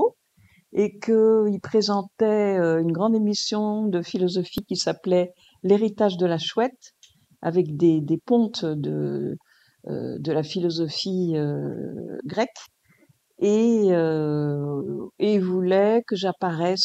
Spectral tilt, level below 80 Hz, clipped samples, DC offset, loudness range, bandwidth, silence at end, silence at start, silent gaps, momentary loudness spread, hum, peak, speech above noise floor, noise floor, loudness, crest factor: -6 dB/octave; -68 dBFS; under 0.1%; under 0.1%; 5 LU; 13 kHz; 0 s; 0 s; none; 10 LU; none; -6 dBFS; 38 dB; -60 dBFS; -23 LUFS; 18 dB